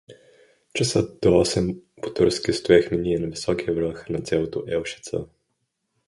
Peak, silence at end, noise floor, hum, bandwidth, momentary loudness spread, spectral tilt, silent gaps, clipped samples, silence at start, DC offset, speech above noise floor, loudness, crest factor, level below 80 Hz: -2 dBFS; 0.8 s; -76 dBFS; none; 11.5 kHz; 13 LU; -5 dB/octave; none; under 0.1%; 0.1 s; under 0.1%; 53 dB; -23 LUFS; 22 dB; -46 dBFS